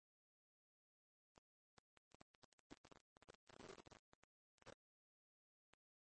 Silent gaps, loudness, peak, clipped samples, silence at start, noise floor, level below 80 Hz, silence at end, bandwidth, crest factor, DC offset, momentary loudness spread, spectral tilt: 1.38-2.70 s, 2.78-2.84 s, 3.01-3.21 s, 3.35-3.47 s, 3.99-4.58 s; -65 LUFS; -48 dBFS; under 0.1%; 1.35 s; under -90 dBFS; -88 dBFS; 1.35 s; 8.4 kHz; 22 dB; under 0.1%; 7 LU; -3.5 dB/octave